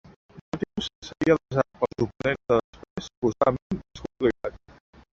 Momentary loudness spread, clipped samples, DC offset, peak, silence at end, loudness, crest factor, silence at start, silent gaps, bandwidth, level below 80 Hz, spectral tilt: 14 LU; under 0.1%; under 0.1%; -6 dBFS; 0.55 s; -27 LUFS; 22 dB; 0.35 s; 0.41-0.52 s, 0.95-1.02 s, 2.64-2.73 s, 2.90-2.96 s, 3.17-3.22 s, 3.62-3.70 s; 7.8 kHz; -52 dBFS; -6.5 dB/octave